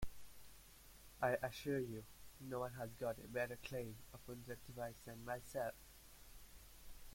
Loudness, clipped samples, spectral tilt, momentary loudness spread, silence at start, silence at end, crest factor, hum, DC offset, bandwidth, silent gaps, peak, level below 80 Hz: -47 LUFS; under 0.1%; -5 dB/octave; 19 LU; 0 s; 0 s; 22 dB; none; under 0.1%; 16.5 kHz; none; -26 dBFS; -62 dBFS